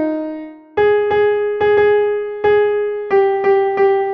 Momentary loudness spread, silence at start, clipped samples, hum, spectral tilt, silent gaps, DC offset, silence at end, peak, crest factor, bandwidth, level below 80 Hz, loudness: 8 LU; 0 s; under 0.1%; none; -7.5 dB/octave; none; under 0.1%; 0 s; -4 dBFS; 12 dB; 5 kHz; -50 dBFS; -15 LUFS